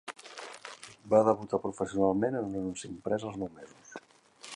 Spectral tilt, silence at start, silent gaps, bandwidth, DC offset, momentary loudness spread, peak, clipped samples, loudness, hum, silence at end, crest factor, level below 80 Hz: -6 dB/octave; 0.05 s; none; 11.5 kHz; under 0.1%; 23 LU; -10 dBFS; under 0.1%; -31 LUFS; none; 0 s; 22 dB; -64 dBFS